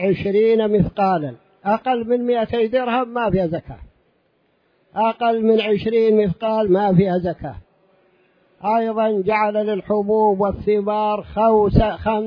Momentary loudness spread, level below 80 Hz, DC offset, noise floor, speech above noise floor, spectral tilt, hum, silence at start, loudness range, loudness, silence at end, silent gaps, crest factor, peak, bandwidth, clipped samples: 7 LU; -38 dBFS; under 0.1%; -63 dBFS; 45 dB; -10 dB/octave; none; 0 s; 3 LU; -19 LUFS; 0 s; none; 18 dB; -2 dBFS; 5.2 kHz; under 0.1%